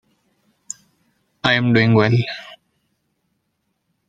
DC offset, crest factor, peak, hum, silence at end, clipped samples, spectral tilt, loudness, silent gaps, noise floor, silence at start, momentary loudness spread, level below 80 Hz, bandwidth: under 0.1%; 20 dB; -2 dBFS; none; 1.55 s; under 0.1%; -6 dB/octave; -17 LUFS; none; -72 dBFS; 1.45 s; 20 LU; -56 dBFS; 9.2 kHz